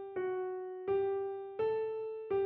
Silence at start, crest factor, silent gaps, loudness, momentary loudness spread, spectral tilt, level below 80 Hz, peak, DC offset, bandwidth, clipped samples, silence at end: 0 s; 12 dB; none; -37 LUFS; 7 LU; -5.5 dB/octave; -74 dBFS; -24 dBFS; under 0.1%; 4.3 kHz; under 0.1%; 0 s